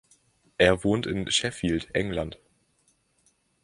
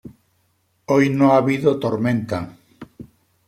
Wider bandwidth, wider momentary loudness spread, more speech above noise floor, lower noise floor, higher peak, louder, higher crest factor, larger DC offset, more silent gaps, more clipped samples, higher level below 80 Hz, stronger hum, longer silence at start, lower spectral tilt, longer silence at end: second, 11.5 kHz vs 13 kHz; second, 11 LU vs 21 LU; second, 43 dB vs 48 dB; about the same, -68 dBFS vs -65 dBFS; second, -6 dBFS vs -2 dBFS; second, -26 LUFS vs -18 LUFS; about the same, 22 dB vs 18 dB; neither; neither; neither; first, -48 dBFS vs -58 dBFS; neither; first, 0.6 s vs 0.05 s; second, -4 dB/octave vs -7.5 dB/octave; first, 1.3 s vs 0.45 s